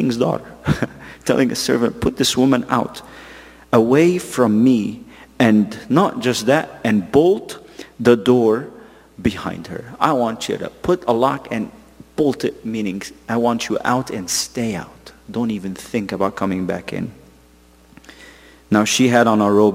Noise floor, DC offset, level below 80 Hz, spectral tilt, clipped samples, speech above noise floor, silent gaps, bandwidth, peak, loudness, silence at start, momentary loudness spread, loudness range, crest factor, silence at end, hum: -49 dBFS; under 0.1%; -48 dBFS; -5 dB/octave; under 0.1%; 32 dB; none; 16 kHz; 0 dBFS; -18 LUFS; 0 s; 15 LU; 6 LU; 18 dB; 0 s; none